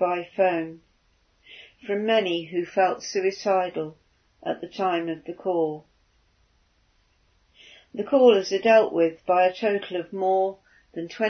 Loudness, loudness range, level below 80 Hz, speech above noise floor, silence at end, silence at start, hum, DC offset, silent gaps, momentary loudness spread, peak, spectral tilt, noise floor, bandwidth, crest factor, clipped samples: -24 LUFS; 9 LU; -70 dBFS; 42 dB; 0 s; 0 s; none; under 0.1%; none; 17 LU; -6 dBFS; -5 dB/octave; -65 dBFS; 6.6 kHz; 20 dB; under 0.1%